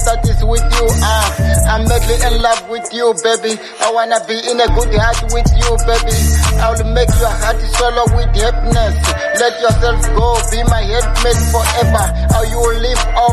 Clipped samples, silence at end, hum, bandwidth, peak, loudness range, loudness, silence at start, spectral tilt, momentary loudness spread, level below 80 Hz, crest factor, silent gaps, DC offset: under 0.1%; 0 s; none; 13.5 kHz; 0 dBFS; 1 LU; -14 LUFS; 0 s; -4 dB/octave; 3 LU; -14 dBFS; 12 dB; none; under 0.1%